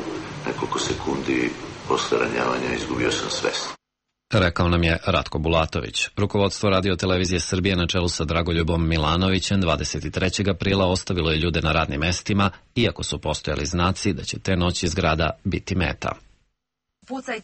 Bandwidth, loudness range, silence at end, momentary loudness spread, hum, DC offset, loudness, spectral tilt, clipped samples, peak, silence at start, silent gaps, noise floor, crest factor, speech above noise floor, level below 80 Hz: 8.8 kHz; 3 LU; 0 s; 7 LU; none; under 0.1%; -23 LUFS; -5 dB/octave; under 0.1%; -6 dBFS; 0 s; none; -81 dBFS; 16 dB; 59 dB; -36 dBFS